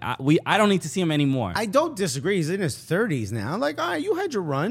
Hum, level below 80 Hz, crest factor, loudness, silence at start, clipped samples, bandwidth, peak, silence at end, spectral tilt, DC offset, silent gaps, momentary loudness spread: none; -60 dBFS; 20 dB; -24 LUFS; 0 s; under 0.1%; 16 kHz; -4 dBFS; 0 s; -5.5 dB/octave; under 0.1%; none; 6 LU